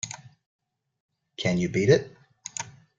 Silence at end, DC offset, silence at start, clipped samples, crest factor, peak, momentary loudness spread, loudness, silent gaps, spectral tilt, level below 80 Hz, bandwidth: 0.3 s; under 0.1%; 0.05 s; under 0.1%; 22 dB; -6 dBFS; 22 LU; -26 LUFS; 0.46-0.59 s, 1.00-1.09 s; -5 dB/octave; -60 dBFS; 9.6 kHz